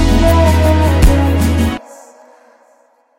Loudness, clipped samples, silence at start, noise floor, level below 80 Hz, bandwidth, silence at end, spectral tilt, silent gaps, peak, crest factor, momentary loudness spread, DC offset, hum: -12 LUFS; under 0.1%; 0 s; -52 dBFS; -16 dBFS; 16.5 kHz; 1.25 s; -6.5 dB/octave; none; 0 dBFS; 12 dB; 7 LU; under 0.1%; none